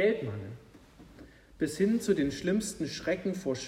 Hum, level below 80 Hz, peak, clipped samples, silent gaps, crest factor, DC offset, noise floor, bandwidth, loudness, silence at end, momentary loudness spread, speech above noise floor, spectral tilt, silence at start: none; -58 dBFS; -14 dBFS; under 0.1%; none; 16 dB; under 0.1%; -54 dBFS; 16 kHz; -31 LUFS; 0 s; 12 LU; 24 dB; -5.5 dB/octave; 0 s